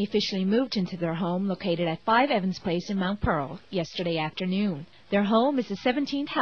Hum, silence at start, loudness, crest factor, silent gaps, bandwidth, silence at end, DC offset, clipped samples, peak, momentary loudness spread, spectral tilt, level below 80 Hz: none; 0 s; -27 LUFS; 16 dB; none; 6.8 kHz; 0 s; 0.2%; under 0.1%; -10 dBFS; 7 LU; -6.5 dB/octave; -50 dBFS